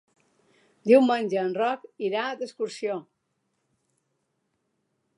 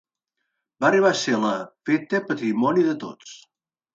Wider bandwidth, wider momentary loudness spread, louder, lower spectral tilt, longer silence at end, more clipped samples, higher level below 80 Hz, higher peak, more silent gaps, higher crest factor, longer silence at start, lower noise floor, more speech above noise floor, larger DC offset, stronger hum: first, 11.5 kHz vs 8 kHz; about the same, 13 LU vs 15 LU; second, -25 LUFS vs -22 LUFS; about the same, -5.5 dB/octave vs -5 dB/octave; first, 2.15 s vs 0.6 s; neither; second, -86 dBFS vs -72 dBFS; about the same, -6 dBFS vs -6 dBFS; neither; about the same, 22 dB vs 18 dB; about the same, 0.85 s vs 0.8 s; second, -76 dBFS vs -80 dBFS; second, 52 dB vs 58 dB; neither; neither